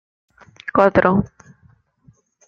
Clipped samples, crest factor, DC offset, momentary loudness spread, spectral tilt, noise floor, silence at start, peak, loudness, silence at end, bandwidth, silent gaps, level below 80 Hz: under 0.1%; 20 dB; under 0.1%; 20 LU; -8.5 dB/octave; -56 dBFS; 0.65 s; -2 dBFS; -16 LUFS; 1.2 s; 7 kHz; none; -48 dBFS